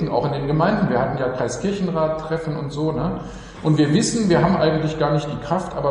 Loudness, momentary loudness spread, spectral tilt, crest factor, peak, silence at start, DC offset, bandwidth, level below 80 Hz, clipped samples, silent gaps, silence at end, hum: -21 LUFS; 8 LU; -6 dB/octave; 16 dB; -4 dBFS; 0 s; under 0.1%; 11 kHz; -42 dBFS; under 0.1%; none; 0 s; none